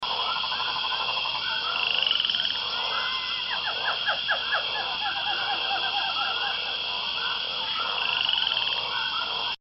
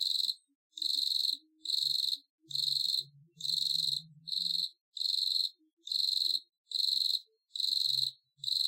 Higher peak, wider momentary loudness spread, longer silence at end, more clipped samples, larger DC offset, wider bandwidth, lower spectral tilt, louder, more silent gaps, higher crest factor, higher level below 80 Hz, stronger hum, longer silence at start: first, -10 dBFS vs -18 dBFS; second, 4 LU vs 10 LU; about the same, 0.05 s vs 0 s; neither; neither; second, 6 kHz vs 17 kHz; second, 3.5 dB/octave vs 0.5 dB/octave; first, -25 LUFS vs -31 LUFS; second, none vs 0.55-0.70 s, 2.30-2.38 s, 4.81-4.92 s, 5.73-5.77 s, 6.58-6.64 s; about the same, 18 dB vs 16 dB; first, -60 dBFS vs under -90 dBFS; neither; about the same, 0 s vs 0 s